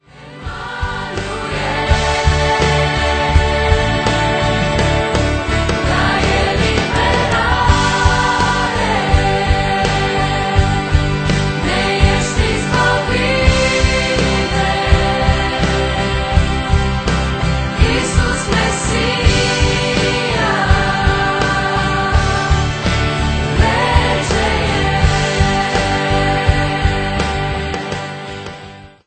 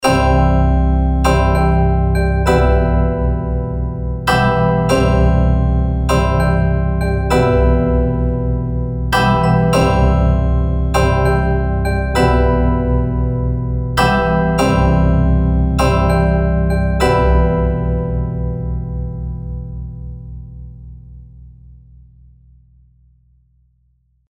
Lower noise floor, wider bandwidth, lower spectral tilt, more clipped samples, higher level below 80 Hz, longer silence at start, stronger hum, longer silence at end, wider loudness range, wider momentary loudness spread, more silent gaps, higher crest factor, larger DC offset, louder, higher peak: second, -35 dBFS vs -59 dBFS; second, 9.2 kHz vs 13 kHz; second, -5 dB/octave vs -7 dB/octave; neither; about the same, -20 dBFS vs -18 dBFS; first, 0.15 s vs 0 s; neither; second, 0.2 s vs 2.6 s; second, 2 LU vs 9 LU; second, 5 LU vs 9 LU; neither; about the same, 14 dB vs 14 dB; neither; about the same, -15 LUFS vs -15 LUFS; about the same, 0 dBFS vs 0 dBFS